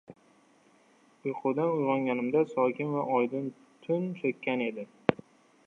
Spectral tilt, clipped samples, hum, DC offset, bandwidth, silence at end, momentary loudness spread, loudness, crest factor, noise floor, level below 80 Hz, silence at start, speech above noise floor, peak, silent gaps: -8.5 dB/octave; under 0.1%; none; under 0.1%; 7.4 kHz; 0.55 s; 9 LU; -30 LUFS; 28 dB; -63 dBFS; -72 dBFS; 0.1 s; 34 dB; -4 dBFS; none